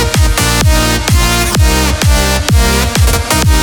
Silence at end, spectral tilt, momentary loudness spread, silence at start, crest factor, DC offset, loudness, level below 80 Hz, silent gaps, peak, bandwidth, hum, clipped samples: 0 s; -4 dB/octave; 1 LU; 0 s; 10 dB; under 0.1%; -10 LUFS; -14 dBFS; none; 0 dBFS; over 20 kHz; none; under 0.1%